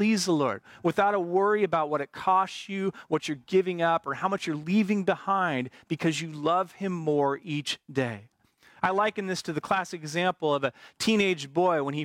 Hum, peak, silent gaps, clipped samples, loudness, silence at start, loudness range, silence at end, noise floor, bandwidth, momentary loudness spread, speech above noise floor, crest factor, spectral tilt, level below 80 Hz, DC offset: none; -12 dBFS; none; under 0.1%; -27 LUFS; 0 s; 3 LU; 0 s; -59 dBFS; 16 kHz; 7 LU; 32 dB; 14 dB; -5 dB/octave; -70 dBFS; under 0.1%